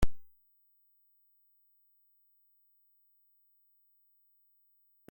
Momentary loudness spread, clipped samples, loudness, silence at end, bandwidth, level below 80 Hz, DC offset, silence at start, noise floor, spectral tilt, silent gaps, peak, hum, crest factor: 0 LU; under 0.1%; -57 LUFS; 4.9 s; 16.5 kHz; -48 dBFS; under 0.1%; 0 s; -70 dBFS; -6 dB/octave; none; -14 dBFS; 50 Hz at -115 dBFS; 24 dB